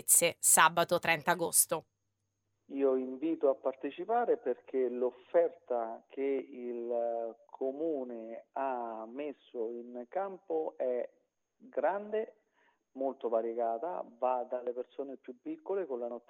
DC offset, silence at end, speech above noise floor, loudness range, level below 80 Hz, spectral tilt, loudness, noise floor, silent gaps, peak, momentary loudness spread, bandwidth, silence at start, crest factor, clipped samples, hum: under 0.1%; 0.1 s; 49 dB; 7 LU; -84 dBFS; -2 dB/octave; -33 LUFS; -83 dBFS; none; -8 dBFS; 15 LU; 16 kHz; 0.05 s; 26 dB; under 0.1%; none